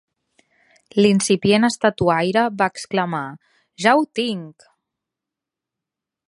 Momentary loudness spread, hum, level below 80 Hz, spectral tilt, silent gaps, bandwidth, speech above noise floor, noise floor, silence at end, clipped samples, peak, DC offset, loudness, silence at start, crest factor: 9 LU; none; -56 dBFS; -4.5 dB/octave; none; 11.5 kHz; 67 dB; -86 dBFS; 1.8 s; under 0.1%; -2 dBFS; under 0.1%; -19 LUFS; 0.95 s; 20 dB